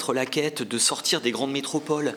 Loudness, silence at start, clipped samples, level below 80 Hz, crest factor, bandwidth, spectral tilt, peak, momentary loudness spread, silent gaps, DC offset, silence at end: -24 LUFS; 0 s; under 0.1%; -82 dBFS; 18 dB; 19 kHz; -2.5 dB/octave; -8 dBFS; 6 LU; none; under 0.1%; 0 s